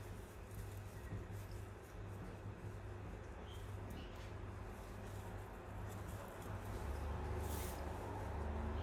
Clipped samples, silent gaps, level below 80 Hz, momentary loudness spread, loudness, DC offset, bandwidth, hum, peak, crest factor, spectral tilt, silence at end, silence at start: under 0.1%; none; -52 dBFS; 7 LU; -49 LUFS; under 0.1%; 16 kHz; none; -32 dBFS; 16 dB; -6 dB/octave; 0 s; 0 s